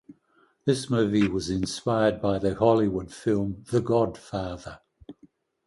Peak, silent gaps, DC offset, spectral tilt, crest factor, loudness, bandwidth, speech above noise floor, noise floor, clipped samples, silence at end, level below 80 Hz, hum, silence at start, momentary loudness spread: -8 dBFS; none; under 0.1%; -6.5 dB/octave; 18 dB; -26 LUFS; 11.5 kHz; 40 dB; -65 dBFS; under 0.1%; 0.55 s; -50 dBFS; none; 0.1 s; 11 LU